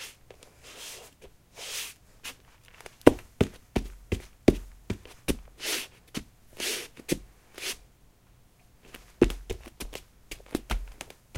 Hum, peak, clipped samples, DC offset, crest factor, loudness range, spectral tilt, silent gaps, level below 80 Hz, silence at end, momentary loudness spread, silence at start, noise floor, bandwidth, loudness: none; 0 dBFS; under 0.1%; under 0.1%; 32 dB; 6 LU; -4.5 dB/octave; none; -42 dBFS; 0 s; 24 LU; 0 s; -59 dBFS; 17 kHz; -31 LUFS